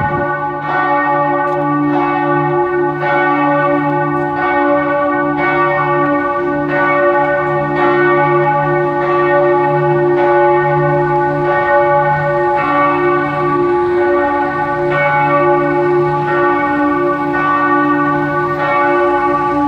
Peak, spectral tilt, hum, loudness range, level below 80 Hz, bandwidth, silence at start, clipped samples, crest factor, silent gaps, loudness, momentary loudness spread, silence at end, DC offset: 0 dBFS; -8.5 dB/octave; none; 2 LU; -44 dBFS; 5.6 kHz; 0 s; under 0.1%; 12 dB; none; -13 LUFS; 4 LU; 0 s; under 0.1%